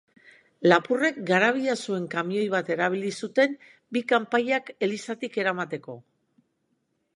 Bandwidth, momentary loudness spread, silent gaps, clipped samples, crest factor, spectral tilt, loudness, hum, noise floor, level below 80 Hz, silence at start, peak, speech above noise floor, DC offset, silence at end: 11.5 kHz; 11 LU; none; under 0.1%; 24 dB; -5 dB/octave; -25 LUFS; none; -74 dBFS; -78 dBFS; 0.6 s; -2 dBFS; 49 dB; under 0.1%; 1.15 s